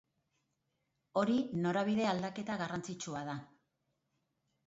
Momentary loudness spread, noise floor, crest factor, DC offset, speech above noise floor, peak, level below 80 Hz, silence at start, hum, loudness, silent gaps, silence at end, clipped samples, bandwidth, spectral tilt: 9 LU; -83 dBFS; 18 dB; under 0.1%; 48 dB; -20 dBFS; -74 dBFS; 1.15 s; none; -36 LUFS; none; 1.25 s; under 0.1%; 8 kHz; -5 dB/octave